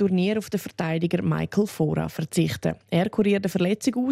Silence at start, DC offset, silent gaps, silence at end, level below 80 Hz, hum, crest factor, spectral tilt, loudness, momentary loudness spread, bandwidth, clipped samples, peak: 0 s; under 0.1%; none; 0 s; -56 dBFS; none; 14 dB; -6.5 dB/octave; -25 LUFS; 6 LU; 16 kHz; under 0.1%; -10 dBFS